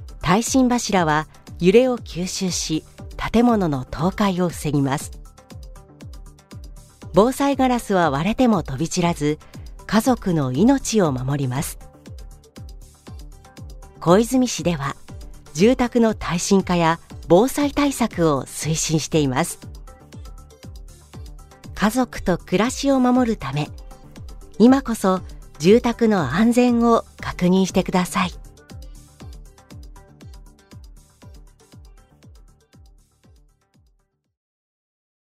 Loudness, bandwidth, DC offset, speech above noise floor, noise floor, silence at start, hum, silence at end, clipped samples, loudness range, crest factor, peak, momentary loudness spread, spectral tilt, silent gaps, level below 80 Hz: -20 LUFS; 15.5 kHz; under 0.1%; 46 dB; -64 dBFS; 0 s; none; 3.5 s; under 0.1%; 7 LU; 20 dB; -2 dBFS; 25 LU; -5.5 dB/octave; none; -40 dBFS